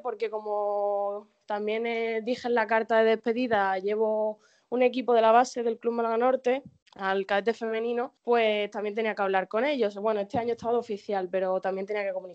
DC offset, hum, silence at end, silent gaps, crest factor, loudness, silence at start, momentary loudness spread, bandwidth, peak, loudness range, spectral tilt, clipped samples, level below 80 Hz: under 0.1%; none; 0 s; 6.82-6.86 s; 18 dB; -27 LUFS; 0.05 s; 9 LU; 8.2 kHz; -8 dBFS; 3 LU; -5 dB/octave; under 0.1%; -74 dBFS